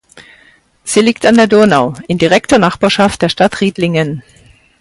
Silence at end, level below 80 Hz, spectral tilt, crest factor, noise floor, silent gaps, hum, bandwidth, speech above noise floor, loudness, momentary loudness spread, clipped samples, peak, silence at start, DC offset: 0.6 s; -44 dBFS; -5 dB/octave; 12 dB; -47 dBFS; none; none; 11.5 kHz; 37 dB; -11 LUFS; 8 LU; under 0.1%; 0 dBFS; 0.15 s; under 0.1%